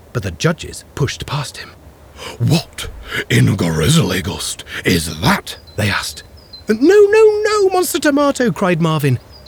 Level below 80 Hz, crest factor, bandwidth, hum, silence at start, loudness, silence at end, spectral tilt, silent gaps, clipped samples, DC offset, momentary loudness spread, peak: -38 dBFS; 14 dB; over 20 kHz; none; 0.15 s; -15 LUFS; 0.1 s; -5 dB/octave; none; under 0.1%; under 0.1%; 17 LU; -2 dBFS